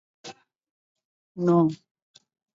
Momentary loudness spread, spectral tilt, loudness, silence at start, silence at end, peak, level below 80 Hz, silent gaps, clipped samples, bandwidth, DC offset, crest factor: 23 LU; -8.5 dB/octave; -23 LUFS; 0.25 s; 0.8 s; -10 dBFS; -72 dBFS; 0.71-0.95 s, 1.05-1.35 s; under 0.1%; 7.6 kHz; under 0.1%; 18 dB